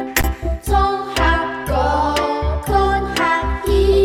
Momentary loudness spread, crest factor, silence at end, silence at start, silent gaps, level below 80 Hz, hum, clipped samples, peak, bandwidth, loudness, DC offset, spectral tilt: 4 LU; 14 dB; 0 s; 0 s; none; -22 dBFS; none; under 0.1%; -2 dBFS; 17 kHz; -18 LUFS; under 0.1%; -5 dB/octave